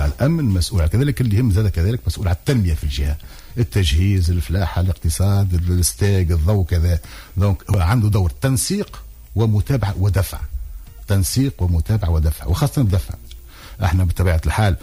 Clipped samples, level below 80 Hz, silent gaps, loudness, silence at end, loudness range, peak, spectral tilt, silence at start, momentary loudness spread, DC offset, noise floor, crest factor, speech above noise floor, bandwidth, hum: under 0.1%; -26 dBFS; none; -19 LUFS; 0.05 s; 2 LU; -6 dBFS; -6 dB/octave; 0 s; 10 LU; under 0.1%; -37 dBFS; 12 dB; 20 dB; 16 kHz; none